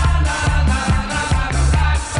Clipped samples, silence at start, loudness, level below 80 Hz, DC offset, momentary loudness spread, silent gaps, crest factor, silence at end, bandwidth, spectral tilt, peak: under 0.1%; 0 s; -18 LUFS; -18 dBFS; under 0.1%; 2 LU; none; 12 dB; 0 s; 11 kHz; -5 dB/octave; -4 dBFS